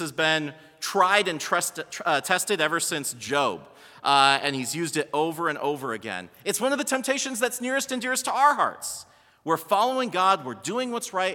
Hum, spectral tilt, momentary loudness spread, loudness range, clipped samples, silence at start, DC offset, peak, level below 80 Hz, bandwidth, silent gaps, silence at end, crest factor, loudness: none; -2.5 dB/octave; 11 LU; 3 LU; under 0.1%; 0 s; under 0.1%; -4 dBFS; -76 dBFS; 18 kHz; none; 0 s; 22 dB; -25 LUFS